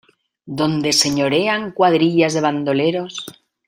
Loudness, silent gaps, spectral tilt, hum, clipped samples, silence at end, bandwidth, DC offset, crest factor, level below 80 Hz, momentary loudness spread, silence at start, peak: -17 LUFS; none; -4 dB/octave; none; under 0.1%; 0.35 s; 16 kHz; under 0.1%; 18 dB; -58 dBFS; 14 LU; 0.45 s; 0 dBFS